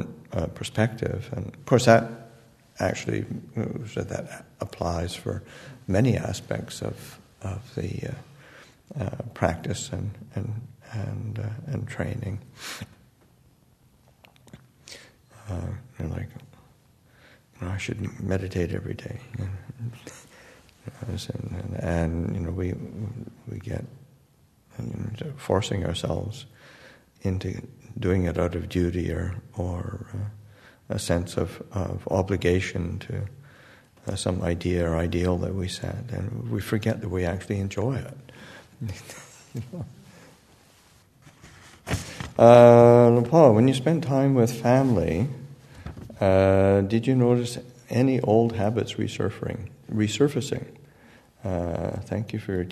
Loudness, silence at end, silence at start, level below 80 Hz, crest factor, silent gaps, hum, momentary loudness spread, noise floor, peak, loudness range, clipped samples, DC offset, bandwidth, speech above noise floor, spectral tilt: -25 LUFS; 0 s; 0 s; -48 dBFS; 26 dB; none; none; 18 LU; -60 dBFS; 0 dBFS; 18 LU; under 0.1%; under 0.1%; 13.5 kHz; 36 dB; -7 dB/octave